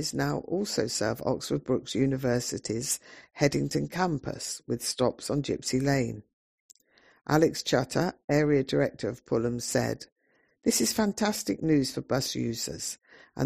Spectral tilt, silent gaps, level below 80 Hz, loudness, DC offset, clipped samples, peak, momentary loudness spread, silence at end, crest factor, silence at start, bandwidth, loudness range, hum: -4.5 dB/octave; 6.33-6.69 s, 8.24-8.28 s, 10.12-10.16 s; -56 dBFS; -29 LUFS; under 0.1%; under 0.1%; -8 dBFS; 9 LU; 0 s; 20 dB; 0 s; 15.5 kHz; 2 LU; none